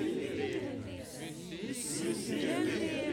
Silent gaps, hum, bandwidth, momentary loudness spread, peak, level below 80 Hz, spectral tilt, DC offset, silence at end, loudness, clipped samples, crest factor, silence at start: none; none; 18 kHz; 10 LU; -20 dBFS; -64 dBFS; -4 dB/octave; under 0.1%; 0 s; -36 LUFS; under 0.1%; 14 dB; 0 s